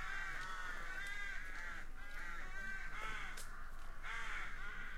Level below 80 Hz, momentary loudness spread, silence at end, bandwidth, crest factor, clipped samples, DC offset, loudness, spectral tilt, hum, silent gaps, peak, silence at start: -48 dBFS; 7 LU; 0 s; 14 kHz; 12 dB; under 0.1%; under 0.1%; -47 LUFS; -2.5 dB/octave; none; none; -32 dBFS; 0 s